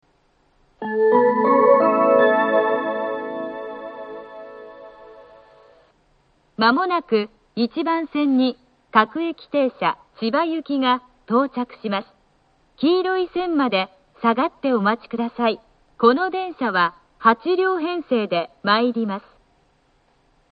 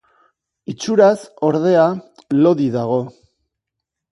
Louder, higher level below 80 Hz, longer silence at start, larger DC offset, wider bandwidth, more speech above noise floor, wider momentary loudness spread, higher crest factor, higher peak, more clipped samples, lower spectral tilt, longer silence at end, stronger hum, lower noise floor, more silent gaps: second, -20 LUFS vs -16 LUFS; about the same, -64 dBFS vs -64 dBFS; about the same, 0.8 s vs 0.7 s; neither; second, 5.2 kHz vs 11.5 kHz; second, 41 dB vs 65 dB; about the same, 16 LU vs 17 LU; about the same, 20 dB vs 18 dB; about the same, 0 dBFS vs 0 dBFS; neither; first, -8.5 dB/octave vs -7 dB/octave; first, 1.35 s vs 1.05 s; neither; second, -62 dBFS vs -81 dBFS; neither